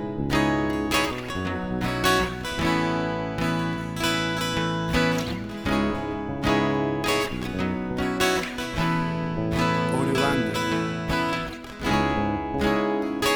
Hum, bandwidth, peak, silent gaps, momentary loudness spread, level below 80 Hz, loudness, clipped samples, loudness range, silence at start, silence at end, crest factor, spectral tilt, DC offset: none; over 20 kHz; -8 dBFS; none; 6 LU; -40 dBFS; -25 LUFS; under 0.1%; 1 LU; 0 s; 0 s; 18 dB; -5 dB/octave; under 0.1%